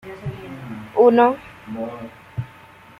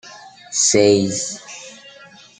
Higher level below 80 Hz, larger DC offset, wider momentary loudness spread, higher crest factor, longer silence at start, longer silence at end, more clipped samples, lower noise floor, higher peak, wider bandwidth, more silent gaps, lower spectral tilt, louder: first, -54 dBFS vs -62 dBFS; neither; about the same, 21 LU vs 22 LU; about the same, 18 dB vs 18 dB; about the same, 0.05 s vs 0.05 s; about the same, 0.55 s vs 0.5 s; neither; about the same, -45 dBFS vs -44 dBFS; about the same, -4 dBFS vs -2 dBFS; second, 5.8 kHz vs 9.6 kHz; neither; first, -8 dB/octave vs -3 dB/octave; about the same, -18 LUFS vs -16 LUFS